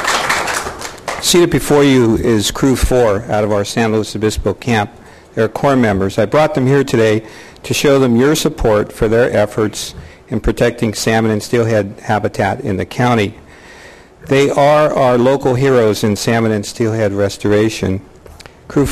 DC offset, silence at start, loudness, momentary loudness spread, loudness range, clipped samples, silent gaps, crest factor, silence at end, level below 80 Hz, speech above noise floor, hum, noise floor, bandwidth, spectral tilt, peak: under 0.1%; 0 s; -14 LUFS; 9 LU; 3 LU; under 0.1%; none; 12 dB; 0 s; -32 dBFS; 25 dB; none; -38 dBFS; 14.5 kHz; -5 dB/octave; 0 dBFS